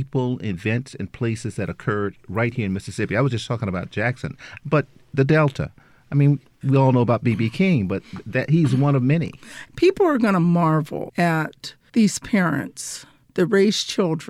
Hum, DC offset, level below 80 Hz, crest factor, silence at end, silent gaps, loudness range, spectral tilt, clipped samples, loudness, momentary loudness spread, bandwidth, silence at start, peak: none; under 0.1%; -52 dBFS; 16 dB; 0.05 s; none; 5 LU; -6.5 dB/octave; under 0.1%; -21 LUFS; 13 LU; 13.5 kHz; 0 s; -4 dBFS